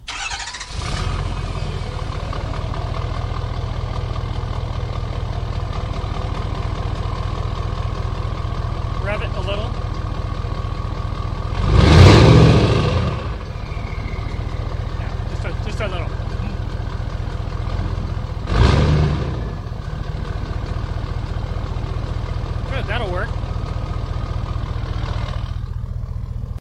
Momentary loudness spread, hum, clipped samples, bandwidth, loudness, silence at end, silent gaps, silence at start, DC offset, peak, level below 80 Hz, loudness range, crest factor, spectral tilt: 11 LU; none; under 0.1%; 10.5 kHz; -21 LUFS; 0 s; none; 0 s; under 0.1%; 0 dBFS; -26 dBFS; 11 LU; 20 dB; -6.5 dB/octave